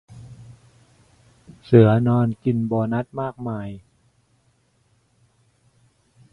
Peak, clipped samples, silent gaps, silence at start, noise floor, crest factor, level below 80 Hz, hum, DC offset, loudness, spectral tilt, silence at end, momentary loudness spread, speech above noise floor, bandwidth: 0 dBFS; under 0.1%; none; 0.1 s; -63 dBFS; 24 dB; -56 dBFS; none; under 0.1%; -20 LUFS; -10 dB/octave; 2.55 s; 28 LU; 44 dB; 5.4 kHz